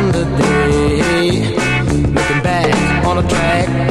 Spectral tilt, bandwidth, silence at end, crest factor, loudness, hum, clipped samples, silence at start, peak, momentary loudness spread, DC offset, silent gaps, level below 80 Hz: -5.5 dB/octave; 13 kHz; 0 s; 12 dB; -14 LUFS; none; under 0.1%; 0 s; -2 dBFS; 2 LU; 0.3%; none; -26 dBFS